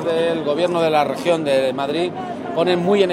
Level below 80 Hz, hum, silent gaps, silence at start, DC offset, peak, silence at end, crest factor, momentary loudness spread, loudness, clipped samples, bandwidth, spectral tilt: -60 dBFS; none; none; 0 s; under 0.1%; -4 dBFS; 0 s; 14 dB; 6 LU; -19 LUFS; under 0.1%; 13.5 kHz; -5.5 dB/octave